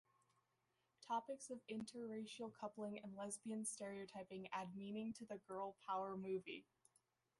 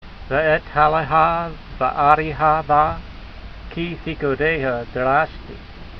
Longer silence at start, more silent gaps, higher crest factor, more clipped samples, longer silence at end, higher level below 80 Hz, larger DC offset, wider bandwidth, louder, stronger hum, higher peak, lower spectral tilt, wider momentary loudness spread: first, 1 s vs 0.05 s; neither; about the same, 18 dB vs 20 dB; neither; first, 0.75 s vs 0 s; second, -88 dBFS vs -36 dBFS; neither; first, 11.5 kHz vs 6 kHz; second, -50 LUFS vs -19 LUFS; neither; second, -32 dBFS vs 0 dBFS; second, -4.5 dB/octave vs -8 dB/octave; second, 7 LU vs 21 LU